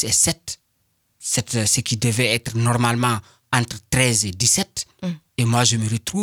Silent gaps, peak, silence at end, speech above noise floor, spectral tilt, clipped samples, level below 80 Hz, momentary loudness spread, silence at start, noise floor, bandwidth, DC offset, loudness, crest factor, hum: none; -2 dBFS; 0 s; 47 dB; -3 dB/octave; under 0.1%; -48 dBFS; 12 LU; 0 s; -68 dBFS; 20 kHz; under 0.1%; -20 LUFS; 20 dB; none